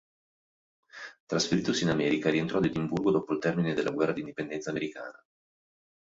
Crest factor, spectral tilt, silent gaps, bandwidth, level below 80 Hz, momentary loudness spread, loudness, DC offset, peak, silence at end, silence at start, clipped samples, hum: 18 dB; -5.5 dB/octave; 1.20-1.27 s; 8 kHz; -62 dBFS; 15 LU; -29 LUFS; under 0.1%; -12 dBFS; 1 s; 0.95 s; under 0.1%; none